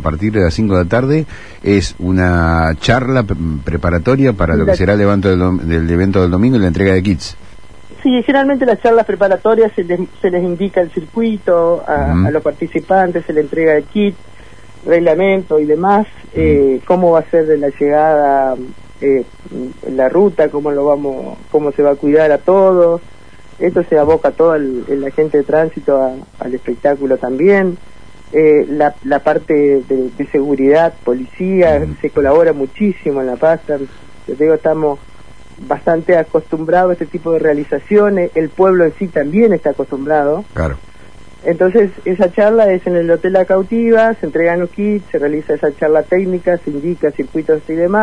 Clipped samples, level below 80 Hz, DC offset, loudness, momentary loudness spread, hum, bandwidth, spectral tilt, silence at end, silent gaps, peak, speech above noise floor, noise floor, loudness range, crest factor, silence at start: under 0.1%; -34 dBFS; 2%; -13 LUFS; 8 LU; none; 10.5 kHz; -8 dB/octave; 0 s; none; 0 dBFS; 27 dB; -39 dBFS; 3 LU; 12 dB; 0 s